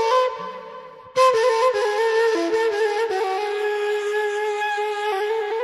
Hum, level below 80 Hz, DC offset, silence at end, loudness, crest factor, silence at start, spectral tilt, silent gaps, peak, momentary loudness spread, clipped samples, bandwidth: none; -70 dBFS; under 0.1%; 0 s; -21 LUFS; 14 dB; 0 s; -2 dB/octave; none; -6 dBFS; 9 LU; under 0.1%; 13 kHz